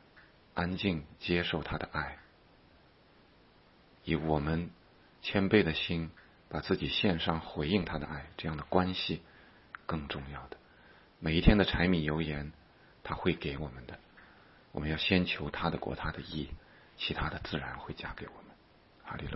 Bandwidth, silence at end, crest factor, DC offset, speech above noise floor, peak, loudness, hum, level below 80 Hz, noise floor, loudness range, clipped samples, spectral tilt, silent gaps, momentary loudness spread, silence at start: 5.8 kHz; 0 s; 26 dB; under 0.1%; 30 dB; -8 dBFS; -33 LUFS; none; -46 dBFS; -62 dBFS; 6 LU; under 0.1%; -9.5 dB/octave; none; 18 LU; 0.15 s